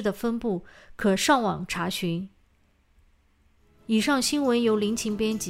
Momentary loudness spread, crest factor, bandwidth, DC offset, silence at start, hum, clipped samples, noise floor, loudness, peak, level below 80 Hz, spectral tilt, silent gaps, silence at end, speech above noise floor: 10 LU; 18 dB; 16 kHz; under 0.1%; 0 s; none; under 0.1%; -64 dBFS; -25 LUFS; -8 dBFS; -54 dBFS; -4 dB/octave; none; 0 s; 38 dB